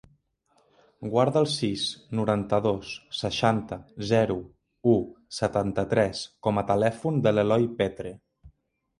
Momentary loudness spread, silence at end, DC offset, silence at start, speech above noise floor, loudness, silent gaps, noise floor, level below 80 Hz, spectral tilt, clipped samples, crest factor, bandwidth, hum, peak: 11 LU; 0.5 s; under 0.1%; 1 s; 42 dB; -26 LUFS; none; -68 dBFS; -54 dBFS; -6 dB/octave; under 0.1%; 20 dB; 11.5 kHz; none; -6 dBFS